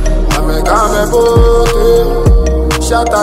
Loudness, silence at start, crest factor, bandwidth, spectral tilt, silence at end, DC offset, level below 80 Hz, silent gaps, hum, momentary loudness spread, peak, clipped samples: -10 LUFS; 0 s; 8 dB; 16 kHz; -5.5 dB/octave; 0 s; under 0.1%; -12 dBFS; none; none; 5 LU; 0 dBFS; under 0.1%